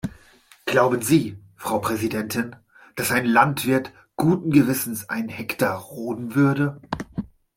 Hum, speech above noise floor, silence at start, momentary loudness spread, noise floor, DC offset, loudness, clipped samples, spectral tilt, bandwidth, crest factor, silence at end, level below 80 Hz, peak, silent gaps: none; 32 dB; 0.05 s; 15 LU; -53 dBFS; under 0.1%; -22 LUFS; under 0.1%; -5.5 dB/octave; 16.5 kHz; 20 dB; 0.3 s; -54 dBFS; -2 dBFS; none